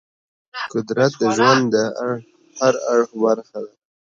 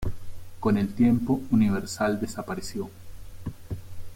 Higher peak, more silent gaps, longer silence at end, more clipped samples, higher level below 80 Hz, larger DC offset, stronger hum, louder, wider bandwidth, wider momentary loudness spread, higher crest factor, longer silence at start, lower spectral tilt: first, 0 dBFS vs -12 dBFS; neither; first, 0.4 s vs 0 s; neither; second, -66 dBFS vs -44 dBFS; neither; neither; first, -19 LUFS vs -26 LUFS; second, 7.8 kHz vs 16.5 kHz; about the same, 17 LU vs 17 LU; about the same, 18 dB vs 16 dB; first, 0.55 s vs 0 s; second, -5 dB/octave vs -6.5 dB/octave